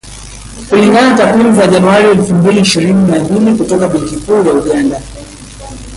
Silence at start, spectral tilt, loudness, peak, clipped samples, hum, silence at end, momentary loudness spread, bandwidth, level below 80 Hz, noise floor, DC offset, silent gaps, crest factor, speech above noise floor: 0.05 s; -5.5 dB/octave; -9 LUFS; 0 dBFS; under 0.1%; none; 0 s; 21 LU; 11.5 kHz; -34 dBFS; -28 dBFS; under 0.1%; none; 10 dB; 20 dB